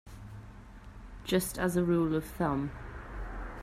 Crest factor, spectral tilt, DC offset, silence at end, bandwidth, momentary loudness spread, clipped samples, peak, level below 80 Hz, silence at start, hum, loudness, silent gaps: 18 dB; -6 dB/octave; under 0.1%; 0 s; 16 kHz; 23 LU; under 0.1%; -16 dBFS; -46 dBFS; 0.05 s; none; -32 LUFS; none